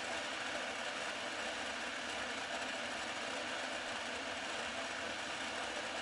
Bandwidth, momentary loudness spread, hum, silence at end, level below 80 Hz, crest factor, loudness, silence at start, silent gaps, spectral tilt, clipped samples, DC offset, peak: 11.5 kHz; 1 LU; none; 0 s; -72 dBFS; 14 dB; -40 LUFS; 0 s; none; -1 dB/octave; under 0.1%; under 0.1%; -28 dBFS